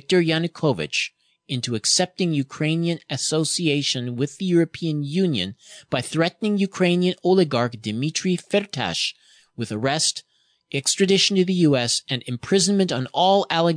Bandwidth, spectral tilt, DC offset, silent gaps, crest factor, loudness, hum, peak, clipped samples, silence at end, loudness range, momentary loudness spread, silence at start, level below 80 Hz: 10 kHz; -4 dB/octave; under 0.1%; none; 16 dB; -22 LUFS; none; -6 dBFS; under 0.1%; 0 s; 3 LU; 8 LU; 0.1 s; -64 dBFS